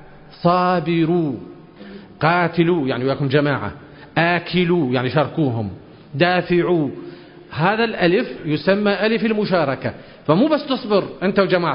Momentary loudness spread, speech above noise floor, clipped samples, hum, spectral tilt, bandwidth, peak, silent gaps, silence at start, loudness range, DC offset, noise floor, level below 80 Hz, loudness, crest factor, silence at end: 13 LU; 21 dB; under 0.1%; none; -11.5 dB/octave; 5.4 kHz; -2 dBFS; none; 0 s; 1 LU; under 0.1%; -39 dBFS; -52 dBFS; -19 LUFS; 18 dB; 0 s